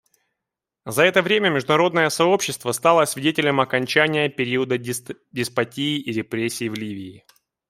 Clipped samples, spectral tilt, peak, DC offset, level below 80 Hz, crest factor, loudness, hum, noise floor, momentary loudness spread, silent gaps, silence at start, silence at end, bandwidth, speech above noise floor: under 0.1%; -4 dB/octave; -2 dBFS; under 0.1%; -66 dBFS; 20 dB; -20 LUFS; none; -85 dBFS; 12 LU; none; 0.85 s; 0.5 s; 16 kHz; 64 dB